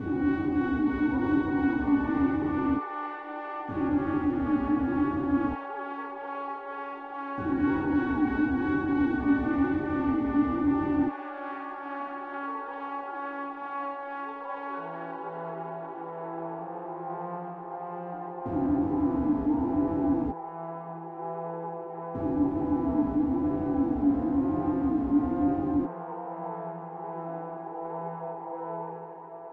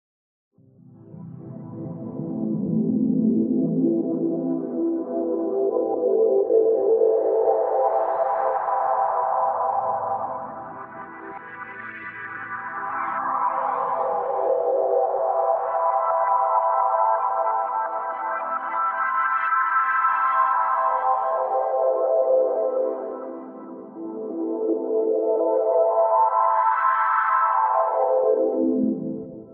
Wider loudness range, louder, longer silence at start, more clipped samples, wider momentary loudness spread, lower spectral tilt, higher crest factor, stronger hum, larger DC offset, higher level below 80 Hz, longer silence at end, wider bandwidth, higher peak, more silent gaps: about the same, 9 LU vs 7 LU; second, -30 LUFS vs -22 LUFS; second, 0 s vs 1 s; neither; second, 11 LU vs 15 LU; first, -10 dB/octave vs -7 dB/octave; about the same, 16 dB vs 14 dB; neither; neither; first, -48 dBFS vs -72 dBFS; about the same, 0 s vs 0 s; first, 4.3 kHz vs 3.6 kHz; second, -14 dBFS vs -8 dBFS; neither